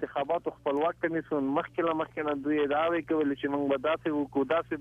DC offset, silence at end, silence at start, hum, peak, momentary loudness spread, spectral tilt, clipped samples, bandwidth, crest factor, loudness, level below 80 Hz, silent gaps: under 0.1%; 0 s; 0 s; none; -16 dBFS; 4 LU; -7.5 dB/octave; under 0.1%; 3.8 kHz; 14 dB; -30 LUFS; -64 dBFS; none